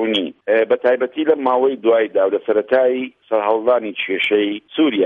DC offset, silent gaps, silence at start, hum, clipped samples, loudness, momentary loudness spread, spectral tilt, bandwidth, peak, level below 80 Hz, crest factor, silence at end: under 0.1%; none; 0 s; none; under 0.1%; -17 LUFS; 5 LU; -6 dB/octave; 4.5 kHz; -2 dBFS; -68 dBFS; 14 dB; 0 s